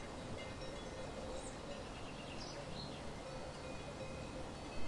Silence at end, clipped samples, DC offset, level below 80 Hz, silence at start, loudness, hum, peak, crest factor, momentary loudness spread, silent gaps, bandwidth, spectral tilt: 0 s; under 0.1%; under 0.1%; -56 dBFS; 0 s; -48 LUFS; none; -30 dBFS; 16 dB; 1 LU; none; 11.5 kHz; -4.5 dB/octave